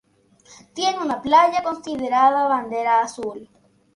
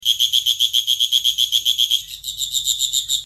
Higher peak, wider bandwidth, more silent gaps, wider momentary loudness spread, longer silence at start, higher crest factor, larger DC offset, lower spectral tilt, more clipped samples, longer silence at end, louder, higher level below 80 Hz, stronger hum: about the same, -4 dBFS vs -4 dBFS; second, 11.5 kHz vs 14 kHz; neither; first, 16 LU vs 6 LU; first, 0.5 s vs 0 s; about the same, 18 dB vs 16 dB; neither; first, -3 dB/octave vs 4 dB/octave; neither; first, 0.5 s vs 0 s; second, -20 LUFS vs -16 LUFS; second, -62 dBFS vs -54 dBFS; neither